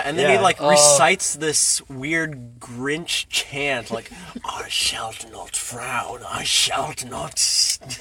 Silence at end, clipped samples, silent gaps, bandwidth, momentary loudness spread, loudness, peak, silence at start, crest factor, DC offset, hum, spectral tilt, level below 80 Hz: 0 s; under 0.1%; none; 17 kHz; 17 LU; -19 LUFS; 0 dBFS; 0 s; 22 dB; under 0.1%; none; -1.5 dB/octave; -52 dBFS